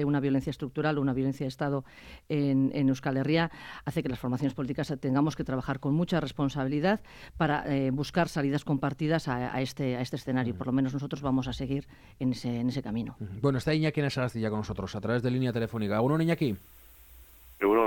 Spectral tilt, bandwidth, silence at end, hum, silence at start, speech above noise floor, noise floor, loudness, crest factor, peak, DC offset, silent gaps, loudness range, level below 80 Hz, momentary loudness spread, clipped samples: -7 dB/octave; 17.5 kHz; 0 s; none; 0 s; 24 dB; -53 dBFS; -30 LUFS; 18 dB; -12 dBFS; under 0.1%; none; 2 LU; -54 dBFS; 7 LU; under 0.1%